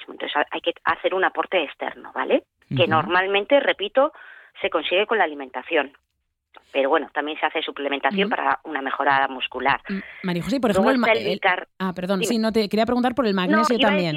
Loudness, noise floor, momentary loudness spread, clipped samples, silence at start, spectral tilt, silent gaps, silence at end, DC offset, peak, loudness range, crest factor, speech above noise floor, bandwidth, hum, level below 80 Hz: -22 LUFS; -64 dBFS; 9 LU; under 0.1%; 0 s; -5 dB/octave; none; 0 s; under 0.1%; -6 dBFS; 3 LU; 16 dB; 42 dB; 15.5 kHz; none; -58 dBFS